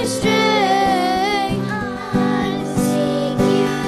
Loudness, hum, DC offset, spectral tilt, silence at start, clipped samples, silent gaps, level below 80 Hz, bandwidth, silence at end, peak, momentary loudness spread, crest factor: -18 LUFS; none; under 0.1%; -5 dB/octave; 0 s; under 0.1%; none; -42 dBFS; 13.5 kHz; 0 s; -4 dBFS; 6 LU; 12 dB